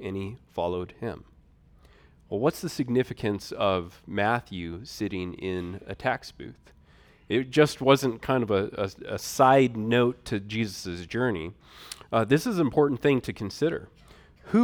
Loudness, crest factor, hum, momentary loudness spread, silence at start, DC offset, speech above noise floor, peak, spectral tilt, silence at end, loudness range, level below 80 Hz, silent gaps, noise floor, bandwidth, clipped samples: -27 LUFS; 22 dB; none; 15 LU; 0 s; under 0.1%; 30 dB; -4 dBFS; -6 dB/octave; 0 s; 7 LU; -56 dBFS; none; -57 dBFS; 19 kHz; under 0.1%